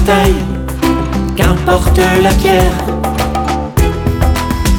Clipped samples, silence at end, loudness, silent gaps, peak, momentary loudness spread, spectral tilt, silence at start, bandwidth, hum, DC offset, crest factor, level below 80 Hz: under 0.1%; 0 s; -12 LUFS; none; 0 dBFS; 6 LU; -5.5 dB/octave; 0 s; 19 kHz; none; under 0.1%; 12 dB; -16 dBFS